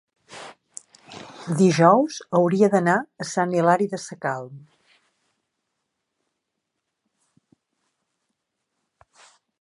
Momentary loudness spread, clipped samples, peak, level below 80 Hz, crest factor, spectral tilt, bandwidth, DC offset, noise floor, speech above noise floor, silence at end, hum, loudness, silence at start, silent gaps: 25 LU; under 0.1%; -2 dBFS; -74 dBFS; 22 dB; -6 dB/octave; 11.5 kHz; under 0.1%; -80 dBFS; 60 dB; 5 s; none; -21 LUFS; 0.3 s; none